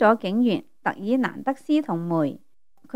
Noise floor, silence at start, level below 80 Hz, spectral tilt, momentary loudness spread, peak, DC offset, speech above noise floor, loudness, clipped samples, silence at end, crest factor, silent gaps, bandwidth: -53 dBFS; 0 s; -72 dBFS; -7.5 dB/octave; 8 LU; -4 dBFS; 0.3%; 30 dB; -24 LUFS; under 0.1%; 0.6 s; 20 dB; none; 11 kHz